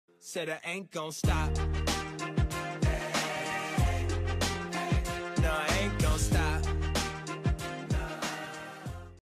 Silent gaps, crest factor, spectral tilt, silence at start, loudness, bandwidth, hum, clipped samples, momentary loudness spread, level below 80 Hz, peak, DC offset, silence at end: none; 14 dB; -4.5 dB/octave; 0.25 s; -32 LUFS; 15 kHz; none; under 0.1%; 8 LU; -36 dBFS; -18 dBFS; under 0.1%; 0.05 s